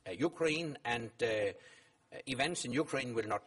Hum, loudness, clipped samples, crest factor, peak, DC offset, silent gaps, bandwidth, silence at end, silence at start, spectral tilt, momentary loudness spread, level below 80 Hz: none; -36 LUFS; under 0.1%; 18 dB; -20 dBFS; under 0.1%; none; 11.5 kHz; 0.05 s; 0.05 s; -4 dB/octave; 9 LU; -70 dBFS